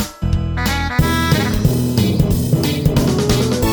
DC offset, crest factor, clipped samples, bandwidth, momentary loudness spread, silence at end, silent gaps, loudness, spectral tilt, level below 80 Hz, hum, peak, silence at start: under 0.1%; 14 dB; under 0.1%; over 20 kHz; 3 LU; 0 s; none; -16 LUFS; -5.5 dB/octave; -26 dBFS; none; -2 dBFS; 0 s